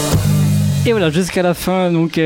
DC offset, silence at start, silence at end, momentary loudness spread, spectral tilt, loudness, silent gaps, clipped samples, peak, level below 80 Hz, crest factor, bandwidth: under 0.1%; 0 s; 0 s; 2 LU; -6 dB/octave; -15 LUFS; none; under 0.1%; -4 dBFS; -34 dBFS; 10 dB; 17 kHz